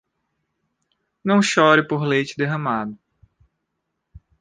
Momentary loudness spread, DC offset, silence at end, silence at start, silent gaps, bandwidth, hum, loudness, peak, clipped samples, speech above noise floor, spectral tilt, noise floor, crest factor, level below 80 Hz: 12 LU; under 0.1%; 0.2 s; 1.25 s; none; 9.8 kHz; none; -19 LUFS; -2 dBFS; under 0.1%; 59 dB; -5 dB/octave; -77 dBFS; 20 dB; -58 dBFS